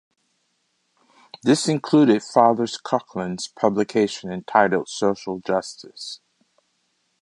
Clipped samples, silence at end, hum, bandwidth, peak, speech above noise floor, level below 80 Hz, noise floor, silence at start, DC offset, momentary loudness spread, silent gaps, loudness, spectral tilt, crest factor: under 0.1%; 1.05 s; none; 11.5 kHz; -2 dBFS; 49 dB; -66 dBFS; -70 dBFS; 1.45 s; under 0.1%; 17 LU; none; -21 LUFS; -5 dB/octave; 22 dB